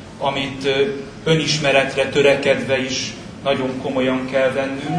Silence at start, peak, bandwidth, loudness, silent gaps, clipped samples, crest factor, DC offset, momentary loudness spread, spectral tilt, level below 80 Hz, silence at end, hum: 0 s; -2 dBFS; 10.5 kHz; -19 LUFS; none; under 0.1%; 18 dB; under 0.1%; 8 LU; -4.5 dB/octave; -48 dBFS; 0 s; none